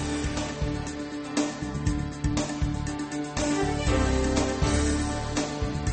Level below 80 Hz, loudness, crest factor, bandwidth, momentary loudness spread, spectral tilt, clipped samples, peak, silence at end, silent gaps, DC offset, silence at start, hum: -34 dBFS; -28 LUFS; 16 dB; 8.8 kHz; 7 LU; -5 dB/octave; under 0.1%; -12 dBFS; 0 s; none; under 0.1%; 0 s; none